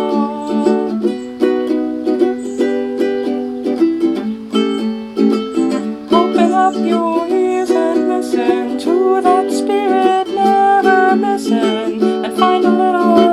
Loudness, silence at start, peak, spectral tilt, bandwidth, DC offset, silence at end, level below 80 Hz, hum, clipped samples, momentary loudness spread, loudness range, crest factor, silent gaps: -15 LUFS; 0 s; 0 dBFS; -5.5 dB/octave; 12.5 kHz; under 0.1%; 0 s; -56 dBFS; none; under 0.1%; 6 LU; 4 LU; 14 dB; none